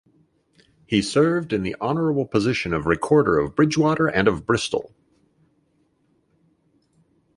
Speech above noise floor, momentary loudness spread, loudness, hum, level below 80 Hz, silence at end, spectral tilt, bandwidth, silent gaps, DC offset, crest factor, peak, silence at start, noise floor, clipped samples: 45 dB; 6 LU; -21 LUFS; none; -48 dBFS; 2.5 s; -6 dB/octave; 11.5 kHz; none; under 0.1%; 20 dB; -4 dBFS; 0.9 s; -65 dBFS; under 0.1%